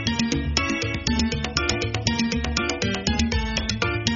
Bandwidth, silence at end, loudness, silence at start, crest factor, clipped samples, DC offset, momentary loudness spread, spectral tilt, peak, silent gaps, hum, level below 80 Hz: 7.2 kHz; 0 s; -24 LUFS; 0 s; 20 dB; under 0.1%; under 0.1%; 1 LU; -3.5 dB/octave; -4 dBFS; none; none; -32 dBFS